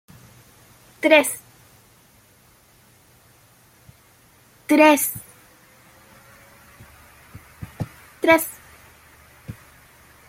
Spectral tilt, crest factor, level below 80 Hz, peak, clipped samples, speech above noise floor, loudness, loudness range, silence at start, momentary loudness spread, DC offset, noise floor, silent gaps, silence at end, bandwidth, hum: -3.5 dB/octave; 24 dB; -58 dBFS; -2 dBFS; under 0.1%; 38 dB; -18 LUFS; 6 LU; 1.05 s; 26 LU; under 0.1%; -55 dBFS; none; 0.75 s; 16.5 kHz; none